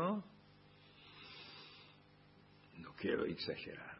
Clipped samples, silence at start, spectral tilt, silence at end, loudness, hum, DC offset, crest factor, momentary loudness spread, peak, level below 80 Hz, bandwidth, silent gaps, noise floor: under 0.1%; 0 s; -4 dB/octave; 0 s; -44 LUFS; 50 Hz at -70 dBFS; under 0.1%; 22 dB; 25 LU; -24 dBFS; -74 dBFS; 5.6 kHz; none; -65 dBFS